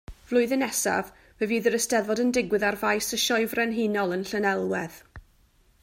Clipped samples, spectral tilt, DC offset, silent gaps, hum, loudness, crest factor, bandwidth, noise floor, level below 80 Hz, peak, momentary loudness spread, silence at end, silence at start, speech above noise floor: under 0.1%; -3 dB/octave; under 0.1%; none; none; -25 LUFS; 16 dB; 16 kHz; -61 dBFS; -56 dBFS; -10 dBFS; 6 LU; 0.6 s; 0.1 s; 36 dB